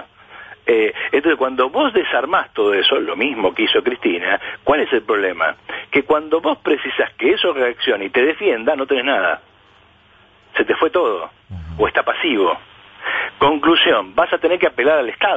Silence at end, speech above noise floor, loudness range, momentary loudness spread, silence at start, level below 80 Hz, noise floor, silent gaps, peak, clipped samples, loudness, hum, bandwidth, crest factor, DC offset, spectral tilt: 0 s; 34 dB; 3 LU; 6 LU; 0 s; -50 dBFS; -51 dBFS; none; -4 dBFS; under 0.1%; -17 LUFS; none; 7.8 kHz; 14 dB; under 0.1%; -6 dB/octave